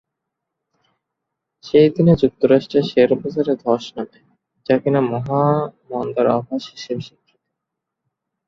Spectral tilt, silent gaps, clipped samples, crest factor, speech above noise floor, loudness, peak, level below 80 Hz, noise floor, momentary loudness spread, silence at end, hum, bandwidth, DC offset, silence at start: -8 dB/octave; none; under 0.1%; 18 dB; 64 dB; -18 LUFS; -2 dBFS; -52 dBFS; -81 dBFS; 14 LU; 1.4 s; none; 7.2 kHz; under 0.1%; 1.65 s